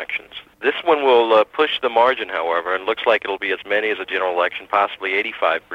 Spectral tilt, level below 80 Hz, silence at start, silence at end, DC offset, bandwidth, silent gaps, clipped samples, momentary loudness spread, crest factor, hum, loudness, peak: -4 dB/octave; -64 dBFS; 0 s; 0 s; under 0.1%; 7.6 kHz; none; under 0.1%; 8 LU; 16 dB; none; -19 LUFS; -2 dBFS